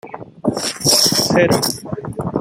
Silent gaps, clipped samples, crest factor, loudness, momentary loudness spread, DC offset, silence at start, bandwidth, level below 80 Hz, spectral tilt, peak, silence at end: none; under 0.1%; 18 dB; -15 LUFS; 14 LU; under 0.1%; 0.05 s; 16.5 kHz; -48 dBFS; -3 dB/octave; 0 dBFS; 0 s